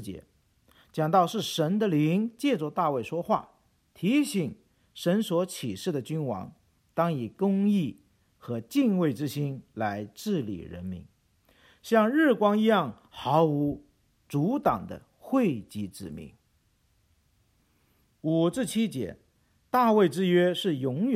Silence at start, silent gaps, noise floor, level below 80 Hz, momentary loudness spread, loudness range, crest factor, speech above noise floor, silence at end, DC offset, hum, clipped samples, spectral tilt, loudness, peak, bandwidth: 0 s; none; -69 dBFS; -64 dBFS; 15 LU; 7 LU; 20 dB; 42 dB; 0 s; under 0.1%; none; under 0.1%; -6.5 dB/octave; -27 LUFS; -8 dBFS; 16 kHz